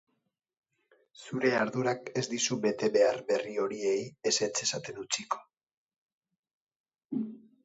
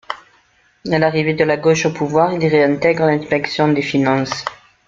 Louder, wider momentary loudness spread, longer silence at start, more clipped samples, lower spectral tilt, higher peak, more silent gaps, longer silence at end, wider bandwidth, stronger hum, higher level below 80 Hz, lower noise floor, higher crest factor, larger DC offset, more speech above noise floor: second, -31 LUFS vs -16 LUFS; about the same, 11 LU vs 10 LU; first, 1.2 s vs 0.1 s; neither; second, -3 dB/octave vs -6 dB/octave; second, -12 dBFS vs -2 dBFS; first, 5.74-5.87 s, 5.96-6.22 s, 6.38-6.43 s, 6.53-6.67 s, 6.76-6.84 s, 7.05-7.09 s vs none; about the same, 0.25 s vs 0.35 s; about the same, 8.2 kHz vs 7.6 kHz; neither; second, -78 dBFS vs -54 dBFS; first, -80 dBFS vs -56 dBFS; about the same, 20 dB vs 16 dB; neither; first, 50 dB vs 40 dB